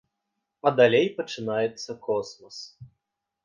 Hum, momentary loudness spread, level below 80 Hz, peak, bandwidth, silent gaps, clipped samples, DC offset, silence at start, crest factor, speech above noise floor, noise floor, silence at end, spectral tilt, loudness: none; 21 LU; -70 dBFS; -6 dBFS; 7.4 kHz; none; under 0.1%; under 0.1%; 0.65 s; 20 dB; 57 dB; -82 dBFS; 0.6 s; -5 dB/octave; -25 LUFS